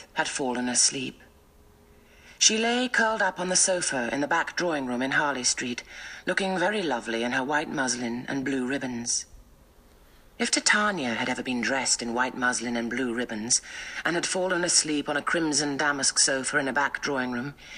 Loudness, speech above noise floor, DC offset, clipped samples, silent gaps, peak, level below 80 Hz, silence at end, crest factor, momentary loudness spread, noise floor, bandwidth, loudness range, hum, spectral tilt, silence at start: -25 LUFS; 29 dB; under 0.1%; under 0.1%; none; -4 dBFS; -58 dBFS; 0 s; 24 dB; 9 LU; -56 dBFS; 15 kHz; 4 LU; none; -1.5 dB/octave; 0 s